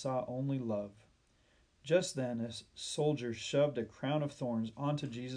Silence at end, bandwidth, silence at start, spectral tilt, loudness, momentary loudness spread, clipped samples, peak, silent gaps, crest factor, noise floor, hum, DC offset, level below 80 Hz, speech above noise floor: 0 s; 10.5 kHz; 0 s; -5.5 dB/octave; -36 LUFS; 8 LU; under 0.1%; -18 dBFS; none; 18 dB; -70 dBFS; none; under 0.1%; -72 dBFS; 34 dB